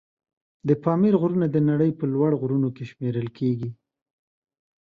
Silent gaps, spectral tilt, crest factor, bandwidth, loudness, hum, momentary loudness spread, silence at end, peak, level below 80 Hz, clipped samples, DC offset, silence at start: none; -11 dB/octave; 18 dB; 5.2 kHz; -23 LUFS; none; 10 LU; 1.1 s; -6 dBFS; -64 dBFS; under 0.1%; under 0.1%; 0.65 s